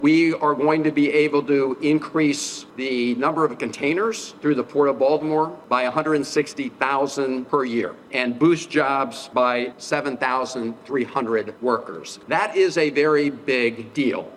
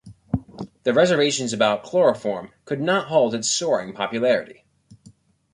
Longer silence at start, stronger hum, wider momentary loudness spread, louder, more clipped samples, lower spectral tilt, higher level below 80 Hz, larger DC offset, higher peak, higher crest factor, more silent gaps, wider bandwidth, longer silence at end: about the same, 0 s vs 0.05 s; neither; second, 7 LU vs 11 LU; about the same, -22 LUFS vs -21 LUFS; neither; about the same, -5 dB/octave vs -4 dB/octave; second, -66 dBFS vs -52 dBFS; neither; about the same, -2 dBFS vs -4 dBFS; about the same, 18 dB vs 18 dB; neither; about the same, 12.5 kHz vs 11.5 kHz; second, 0 s vs 1 s